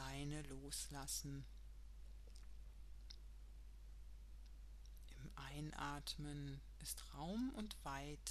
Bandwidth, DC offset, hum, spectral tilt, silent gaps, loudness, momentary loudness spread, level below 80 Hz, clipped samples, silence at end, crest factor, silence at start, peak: 13 kHz; under 0.1%; none; -4 dB/octave; none; -51 LUFS; 15 LU; -58 dBFS; under 0.1%; 0 s; 24 dB; 0 s; -28 dBFS